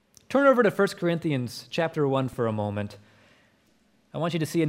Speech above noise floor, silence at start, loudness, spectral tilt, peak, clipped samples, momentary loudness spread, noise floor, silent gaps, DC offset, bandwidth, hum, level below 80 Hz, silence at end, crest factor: 39 dB; 0.3 s; -25 LUFS; -6.5 dB/octave; -8 dBFS; under 0.1%; 11 LU; -64 dBFS; none; under 0.1%; 16 kHz; none; -66 dBFS; 0 s; 18 dB